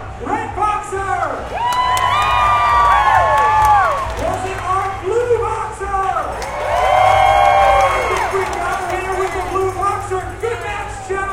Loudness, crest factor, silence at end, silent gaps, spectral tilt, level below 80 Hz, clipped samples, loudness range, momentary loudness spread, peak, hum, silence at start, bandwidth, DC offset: -16 LUFS; 16 dB; 0 s; none; -4 dB/octave; -32 dBFS; under 0.1%; 5 LU; 11 LU; 0 dBFS; none; 0 s; 16.5 kHz; under 0.1%